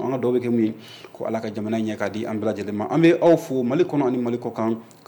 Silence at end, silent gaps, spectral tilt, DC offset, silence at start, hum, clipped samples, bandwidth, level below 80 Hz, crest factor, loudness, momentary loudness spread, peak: 0.25 s; none; -7.5 dB/octave; under 0.1%; 0 s; none; under 0.1%; 19 kHz; -68 dBFS; 16 dB; -22 LUFS; 10 LU; -6 dBFS